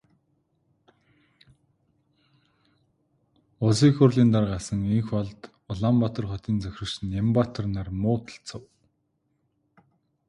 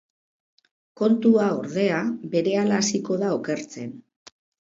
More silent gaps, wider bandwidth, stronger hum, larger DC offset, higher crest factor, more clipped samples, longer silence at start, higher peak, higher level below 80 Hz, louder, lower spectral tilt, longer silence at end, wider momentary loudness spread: neither; first, 11 kHz vs 7.8 kHz; neither; neither; about the same, 22 dB vs 18 dB; neither; first, 3.6 s vs 1 s; about the same, -6 dBFS vs -6 dBFS; first, -50 dBFS vs -70 dBFS; about the same, -25 LUFS vs -23 LUFS; first, -7 dB/octave vs -5 dB/octave; first, 1.7 s vs 0.75 s; first, 17 LU vs 11 LU